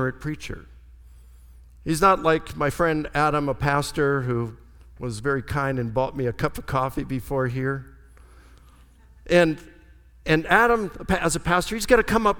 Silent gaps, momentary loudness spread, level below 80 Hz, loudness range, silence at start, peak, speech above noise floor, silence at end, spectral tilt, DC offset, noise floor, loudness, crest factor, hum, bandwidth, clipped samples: none; 15 LU; -42 dBFS; 5 LU; 0 s; -2 dBFS; 28 dB; 0 s; -5.5 dB/octave; under 0.1%; -51 dBFS; -23 LUFS; 22 dB; none; 19 kHz; under 0.1%